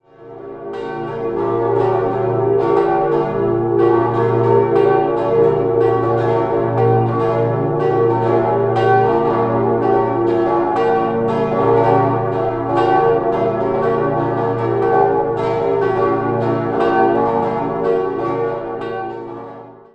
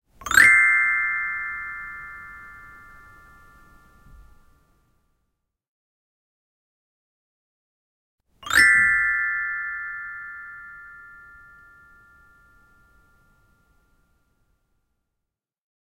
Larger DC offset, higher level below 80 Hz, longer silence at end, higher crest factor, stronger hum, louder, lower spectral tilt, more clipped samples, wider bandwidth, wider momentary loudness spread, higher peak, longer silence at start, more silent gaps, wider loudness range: neither; first, -46 dBFS vs -56 dBFS; second, 0.2 s vs 4.95 s; second, 14 dB vs 26 dB; neither; about the same, -16 LUFS vs -18 LUFS; first, -9.5 dB/octave vs 0 dB/octave; neither; second, 6 kHz vs 16.5 kHz; second, 8 LU vs 27 LU; about the same, -2 dBFS vs 0 dBFS; about the same, 0.2 s vs 0.2 s; second, none vs 5.68-8.18 s; second, 2 LU vs 22 LU